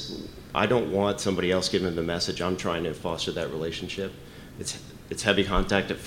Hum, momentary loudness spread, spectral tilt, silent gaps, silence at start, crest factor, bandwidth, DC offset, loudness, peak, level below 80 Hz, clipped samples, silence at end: none; 12 LU; -4.5 dB/octave; none; 0 s; 22 dB; 16.5 kHz; under 0.1%; -27 LUFS; -6 dBFS; -42 dBFS; under 0.1%; 0 s